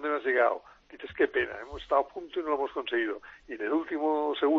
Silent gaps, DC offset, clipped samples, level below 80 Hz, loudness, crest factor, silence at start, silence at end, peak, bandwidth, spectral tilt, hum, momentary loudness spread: none; under 0.1%; under 0.1%; -60 dBFS; -30 LUFS; 18 dB; 0 s; 0 s; -12 dBFS; 6.6 kHz; -6 dB/octave; none; 15 LU